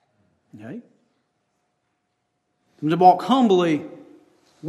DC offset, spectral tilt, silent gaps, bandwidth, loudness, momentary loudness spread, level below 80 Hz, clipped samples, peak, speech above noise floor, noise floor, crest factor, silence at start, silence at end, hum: under 0.1%; -7 dB/octave; none; 11.5 kHz; -18 LUFS; 24 LU; -74 dBFS; under 0.1%; 0 dBFS; 56 dB; -74 dBFS; 22 dB; 0.55 s; 0 s; none